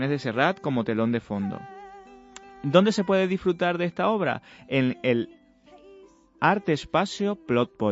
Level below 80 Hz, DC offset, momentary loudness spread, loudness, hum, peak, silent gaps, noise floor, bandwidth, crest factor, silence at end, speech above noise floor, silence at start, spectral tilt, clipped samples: -60 dBFS; under 0.1%; 12 LU; -25 LUFS; none; -4 dBFS; none; -53 dBFS; 8 kHz; 20 dB; 0 s; 29 dB; 0 s; -6.5 dB/octave; under 0.1%